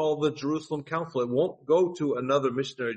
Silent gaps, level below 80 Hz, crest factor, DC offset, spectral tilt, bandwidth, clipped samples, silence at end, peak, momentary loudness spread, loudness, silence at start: none; -70 dBFS; 14 dB; under 0.1%; -6.5 dB/octave; 8.4 kHz; under 0.1%; 0 s; -12 dBFS; 7 LU; -27 LUFS; 0 s